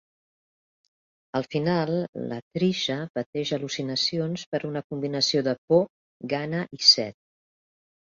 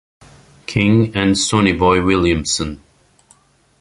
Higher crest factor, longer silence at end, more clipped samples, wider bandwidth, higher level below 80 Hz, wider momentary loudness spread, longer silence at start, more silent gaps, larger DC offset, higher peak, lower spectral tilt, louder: first, 24 dB vs 16 dB; about the same, 1 s vs 1.05 s; neither; second, 7.6 kHz vs 11.5 kHz; second, -68 dBFS vs -36 dBFS; about the same, 14 LU vs 12 LU; first, 1.35 s vs 0.7 s; first, 2.08-2.13 s, 2.42-2.51 s, 3.10-3.14 s, 3.26-3.33 s, 4.46-4.52 s, 4.84-4.90 s, 5.58-5.68 s, 5.90-6.20 s vs none; neither; about the same, -4 dBFS vs -2 dBFS; about the same, -4.5 dB/octave vs -4.5 dB/octave; second, -25 LUFS vs -15 LUFS